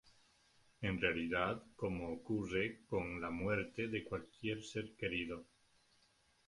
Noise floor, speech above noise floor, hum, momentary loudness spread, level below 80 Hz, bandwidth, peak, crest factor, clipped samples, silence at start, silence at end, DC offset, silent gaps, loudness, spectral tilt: -74 dBFS; 33 dB; none; 7 LU; -62 dBFS; 11.5 kHz; -18 dBFS; 24 dB; under 0.1%; 0.05 s; 1.05 s; under 0.1%; none; -41 LUFS; -6 dB/octave